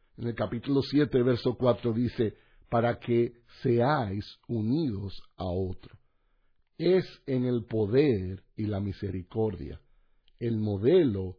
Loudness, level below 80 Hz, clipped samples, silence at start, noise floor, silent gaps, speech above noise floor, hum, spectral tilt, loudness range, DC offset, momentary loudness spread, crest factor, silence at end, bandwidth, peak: -29 LUFS; -54 dBFS; under 0.1%; 0.2 s; -67 dBFS; none; 39 dB; none; -9.5 dB/octave; 4 LU; under 0.1%; 12 LU; 18 dB; 0.05 s; 5.4 kHz; -12 dBFS